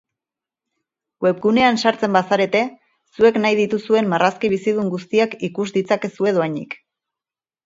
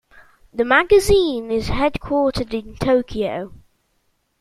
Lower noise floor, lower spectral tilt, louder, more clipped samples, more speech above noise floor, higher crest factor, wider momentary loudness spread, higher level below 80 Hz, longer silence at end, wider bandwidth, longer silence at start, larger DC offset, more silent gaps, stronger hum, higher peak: first, under -90 dBFS vs -67 dBFS; about the same, -5.5 dB/octave vs -5 dB/octave; about the same, -18 LUFS vs -19 LUFS; neither; first, over 72 dB vs 49 dB; about the same, 18 dB vs 18 dB; second, 8 LU vs 13 LU; second, -62 dBFS vs -36 dBFS; about the same, 0.9 s vs 0.85 s; second, 7.8 kHz vs 14 kHz; first, 1.2 s vs 0.15 s; neither; neither; neither; about the same, 0 dBFS vs -2 dBFS